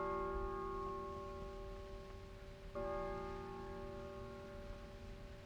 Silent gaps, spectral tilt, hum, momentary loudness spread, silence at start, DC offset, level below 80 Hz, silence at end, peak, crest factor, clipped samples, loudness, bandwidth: none; -7 dB/octave; none; 11 LU; 0 s; under 0.1%; -54 dBFS; 0 s; -32 dBFS; 14 dB; under 0.1%; -48 LUFS; 18.5 kHz